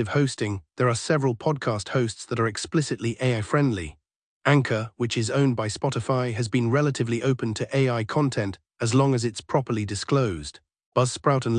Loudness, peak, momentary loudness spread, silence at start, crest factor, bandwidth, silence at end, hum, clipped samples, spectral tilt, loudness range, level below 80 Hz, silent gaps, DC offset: -25 LUFS; -6 dBFS; 6 LU; 0 s; 18 dB; 10.5 kHz; 0 s; none; under 0.1%; -6 dB/octave; 1 LU; -56 dBFS; 4.16-4.41 s, 10.86-10.92 s; under 0.1%